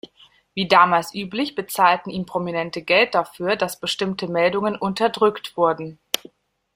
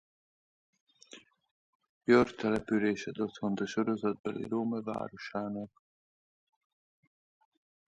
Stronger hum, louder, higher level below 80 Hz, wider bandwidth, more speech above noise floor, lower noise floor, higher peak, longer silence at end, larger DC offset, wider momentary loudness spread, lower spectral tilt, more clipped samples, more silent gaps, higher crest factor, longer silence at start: neither; first, -21 LUFS vs -32 LUFS; first, -62 dBFS vs -68 dBFS; first, 16 kHz vs 9.4 kHz; first, 34 dB vs 25 dB; about the same, -55 dBFS vs -57 dBFS; first, -2 dBFS vs -12 dBFS; second, 0.6 s vs 2.25 s; neither; second, 10 LU vs 13 LU; second, -4 dB/octave vs -6.5 dB/octave; neither; second, none vs 1.51-1.80 s, 1.89-2.01 s, 4.19-4.24 s; about the same, 20 dB vs 24 dB; second, 0.55 s vs 1.15 s